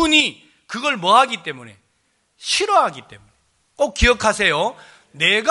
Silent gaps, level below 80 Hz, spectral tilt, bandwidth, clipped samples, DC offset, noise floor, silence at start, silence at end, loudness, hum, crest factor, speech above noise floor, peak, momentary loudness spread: none; -34 dBFS; -2.5 dB/octave; 11.5 kHz; under 0.1%; under 0.1%; -66 dBFS; 0 s; 0 s; -17 LUFS; none; 18 dB; 47 dB; 0 dBFS; 17 LU